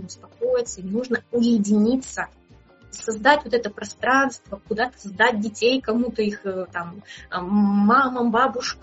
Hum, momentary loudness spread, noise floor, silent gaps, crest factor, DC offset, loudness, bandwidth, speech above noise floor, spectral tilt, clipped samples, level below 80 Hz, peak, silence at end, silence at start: none; 14 LU; -51 dBFS; none; 22 dB; under 0.1%; -22 LUFS; 8 kHz; 30 dB; -4 dB/octave; under 0.1%; -54 dBFS; -2 dBFS; 0.1 s; 0 s